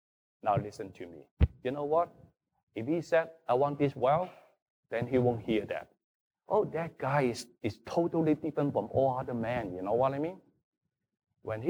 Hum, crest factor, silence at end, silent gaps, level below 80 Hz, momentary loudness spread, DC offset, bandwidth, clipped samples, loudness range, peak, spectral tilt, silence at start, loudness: none; 20 dB; 0 s; 1.31-1.37 s, 2.63-2.67 s, 4.62-4.83 s, 6.04-6.31 s, 10.64-10.72 s; -46 dBFS; 11 LU; under 0.1%; over 20 kHz; under 0.1%; 2 LU; -12 dBFS; -7.5 dB/octave; 0.45 s; -32 LUFS